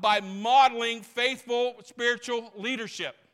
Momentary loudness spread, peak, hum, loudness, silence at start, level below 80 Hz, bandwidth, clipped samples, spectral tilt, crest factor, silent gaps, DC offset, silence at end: 12 LU; -10 dBFS; none; -26 LUFS; 0 s; -78 dBFS; 14.5 kHz; under 0.1%; -2.5 dB/octave; 18 dB; none; under 0.1%; 0.2 s